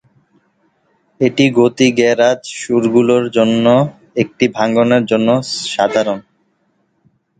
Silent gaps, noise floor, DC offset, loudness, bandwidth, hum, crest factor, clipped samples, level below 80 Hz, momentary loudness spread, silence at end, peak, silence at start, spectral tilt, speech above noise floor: none; -62 dBFS; under 0.1%; -14 LUFS; 9.4 kHz; none; 14 dB; under 0.1%; -56 dBFS; 8 LU; 1.2 s; 0 dBFS; 1.2 s; -5.5 dB/octave; 49 dB